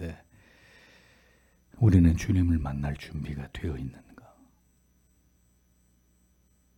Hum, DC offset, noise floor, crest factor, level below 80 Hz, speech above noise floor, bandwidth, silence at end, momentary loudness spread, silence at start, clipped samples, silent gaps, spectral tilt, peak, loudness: none; under 0.1%; -66 dBFS; 22 dB; -44 dBFS; 40 dB; 11.5 kHz; 2.85 s; 19 LU; 0 s; under 0.1%; none; -8 dB/octave; -8 dBFS; -27 LUFS